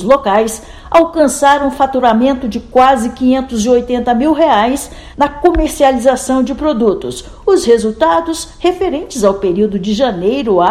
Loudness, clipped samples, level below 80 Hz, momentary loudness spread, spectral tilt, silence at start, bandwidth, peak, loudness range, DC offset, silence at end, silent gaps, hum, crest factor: -12 LUFS; 0.6%; -32 dBFS; 7 LU; -4.5 dB/octave; 0 s; 16 kHz; 0 dBFS; 2 LU; under 0.1%; 0 s; none; none; 12 dB